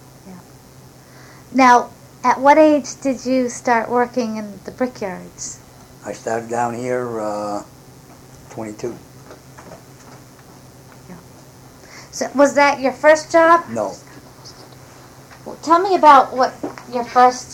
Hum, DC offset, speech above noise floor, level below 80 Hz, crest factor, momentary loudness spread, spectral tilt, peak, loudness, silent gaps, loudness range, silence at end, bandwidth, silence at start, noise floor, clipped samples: none; under 0.1%; 27 dB; -56 dBFS; 18 dB; 20 LU; -4 dB/octave; 0 dBFS; -16 LUFS; none; 18 LU; 0 s; 17.5 kHz; 0.25 s; -43 dBFS; under 0.1%